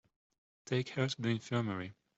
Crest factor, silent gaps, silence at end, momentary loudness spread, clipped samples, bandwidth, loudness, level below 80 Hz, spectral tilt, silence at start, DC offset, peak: 18 dB; none; 0.25 s; 5 LU; under 0.1%; 8 kHz; -36 LUFS; -74 dBFS; -6 dB/octave; 0.65 s; under 0.1%; -20 dBFS